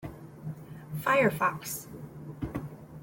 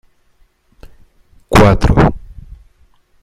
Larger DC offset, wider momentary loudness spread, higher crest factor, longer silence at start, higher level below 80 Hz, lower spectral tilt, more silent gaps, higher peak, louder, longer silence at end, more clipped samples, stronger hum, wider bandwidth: neither; first, 20 LU vs 8 LU; about the same, 20 dB vs 16 dB; second, 0 s vs 0.85 s; second, -56 dBFS vs -24 dBFS; second, -5 dB/octave vs -7 dB/octave; neither; second, -12 dBFS vs 0 dBFS; second, -30 LUFS vs -11 LUFS; second, 0 s vs 0.9 s; neither; neither; about the same, 17 kHz vs 15.5 kHz